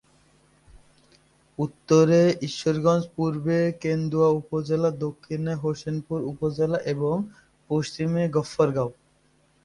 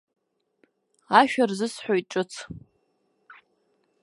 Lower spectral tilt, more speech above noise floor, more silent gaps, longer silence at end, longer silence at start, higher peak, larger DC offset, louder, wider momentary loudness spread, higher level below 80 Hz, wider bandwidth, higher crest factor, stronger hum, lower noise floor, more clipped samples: first, -7 dB/octave vs -4.5 dB/octave; second, 40 dB vs 47 dB; neither; second, 0.7 s vs 1.45 s; second, 0.75 s vs 1.1 s; second, -8 dBFS vs -2 dBFS; neither; about the same, -25 LUFS vs -24 LUFS; second, 11 LU vs 21 LU; first, -58 dBFS vs -64 dBFS; about the same, 11 kHz vs 11.5 kHz; second, 18 dB vs 26 dB; neither; second, -63 dBFS vs -71 dBFS; neither